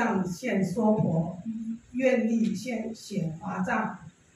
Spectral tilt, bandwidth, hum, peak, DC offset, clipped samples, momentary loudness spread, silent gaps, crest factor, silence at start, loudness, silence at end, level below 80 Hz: -7 dB/octave; 12.5 kHz; none; -12 dBFS; under 0.1%; under 0.1%; 10 LU; none; 16 dB; 0 s; -29 LUFS; 0.25 s; -64 dBFS